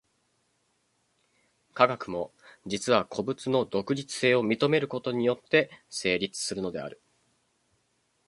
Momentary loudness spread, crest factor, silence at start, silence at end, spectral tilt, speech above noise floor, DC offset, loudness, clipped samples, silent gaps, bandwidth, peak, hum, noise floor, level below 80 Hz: 11 LU; 26 dB; 1.75 s; 1.35 s; -4.5 dB/octave; 45 dB; under 0.1%; -28 LUFS; under 0.1%; none; 11.5 kHz; -4 dBFS; none; -73 dBFS; -66 dBFS